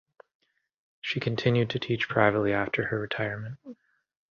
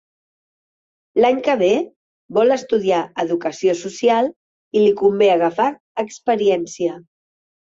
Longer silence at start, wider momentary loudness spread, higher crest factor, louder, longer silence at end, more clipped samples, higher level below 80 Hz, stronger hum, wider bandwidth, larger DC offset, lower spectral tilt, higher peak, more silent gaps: about the same, 1.05 s vs 1.15 s; first, 14 LU vs 9 LU; first, 24 dB vs 16 dB; second, -27 LUFS vs -18 LUFS; second, 0.55 s vs 0.7 s; neither; about the same, -60 dBFS vs -64 dBFS; neither; second, 7 kHz vs 7.8 kHz; neither; first, -7 dB/octave vs -5 dB/octave; about the same, -6 dBFS vs -4 dBFS; second, none vs 1.96-2.29 s, 4.36-4.71 s, 5.80-5.95 s